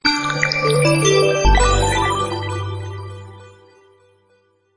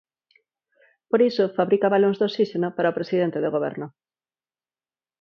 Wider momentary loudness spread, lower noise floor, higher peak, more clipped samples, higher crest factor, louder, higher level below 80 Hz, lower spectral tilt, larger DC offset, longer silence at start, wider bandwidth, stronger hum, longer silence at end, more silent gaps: first, 16 LU vs 7 LU; second, -59 dBFS vs under -90 dBFS; first, 0 dBFS vs -6 dBFS; neither; about the same, 18 dB vs 18 dB; first, -17 LUFS vs -22 LUFS; first, -26 dBFS vs -74 dBFS; second, -4 dB/octave vs -8 dB/octave; neither; second, 0.05 s vs 1.15 s; first, 10 kHz vs 6.4 kHz; neither; about the same, 1.3 s vs 1.3 s; neither